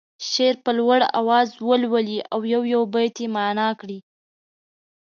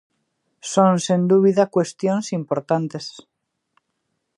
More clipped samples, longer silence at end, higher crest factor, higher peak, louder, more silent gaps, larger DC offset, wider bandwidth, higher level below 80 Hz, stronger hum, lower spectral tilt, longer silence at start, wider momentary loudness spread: neither; about the same, 1.1 s vs 1.15 s; about the same, 18 dB vs 20 dB; about the same, -4 dBFS vs -2 dBFS; about the same, -21 LUFS vs -19 LUFS; neither; neither; second, 7.2 kHz vs 11 kHz; second, -78 dBFS vs -72 dBFS; neither; second, -4 dB/octave vs -6 dB/octave; second, 0.2 s vs 0.65 s; second, 7 LU vs 14 LU